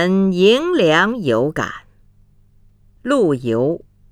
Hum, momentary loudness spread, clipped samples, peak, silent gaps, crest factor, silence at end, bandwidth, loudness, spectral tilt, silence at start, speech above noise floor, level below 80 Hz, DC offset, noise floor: 50 Hz at -50 dBFS; 14 LU; under 0.1%; -2 dBFS; none; 16 dB; 0.35 s; 13.5 kHz; -16 LUFS; -6 dB/octave; 0 s; 35 dB; -50 dBFS; under 0.1%; -51 dBFS